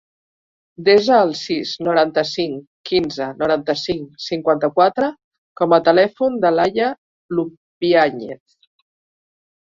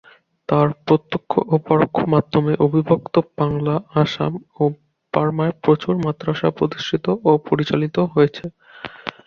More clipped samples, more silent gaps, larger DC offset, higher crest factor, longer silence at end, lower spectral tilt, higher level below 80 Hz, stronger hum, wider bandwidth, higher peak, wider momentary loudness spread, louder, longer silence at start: neither; first, 2.67-2.84 s, 5.24-5.31 s, 5.38-5.56 s, 6.98-7.29 s, 7.57-7.81 s vs none; neither; about the same, 18 dB vs 18 dB; first, 1.35 s vs 0.15 s; second, -5.5 dB/octave vs -8 dB/octave; about the same, -58 dBFS vs -54 dBFS; neither; first, 7.6 kHz vs 6.8 kHz; about the same, -2 dBFS vs -2 dBFS; first, 11 LU vs 7 LU; about the same, -18 LUFS vs -19 LUFS; first, 0.8 s vs 0.5 s